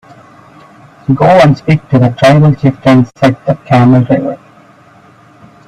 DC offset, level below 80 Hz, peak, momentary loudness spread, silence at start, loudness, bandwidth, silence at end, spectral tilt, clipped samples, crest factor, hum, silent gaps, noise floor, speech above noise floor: under 0.1%; -42 dBFS; 0 dBFS; 9 LU; 1.1 s; -8 LUFS; 10.5 kHz; 1.3 s; -8 dB/octave; under 0.1%; 10 dB; none; none; -41 dBFS; 33 dB